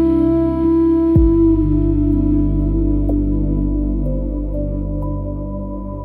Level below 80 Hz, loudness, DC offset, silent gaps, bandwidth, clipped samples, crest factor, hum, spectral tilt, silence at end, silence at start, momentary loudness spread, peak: -22 dBFS; -17 LUFS; under 0.1%; none; 3.3 kHz; under 0.1%; 14 dB; 50 Hz at -25 dBFS; -12.5 dB/octave; 0 s; 0 s; 11 LU; -2 dBFS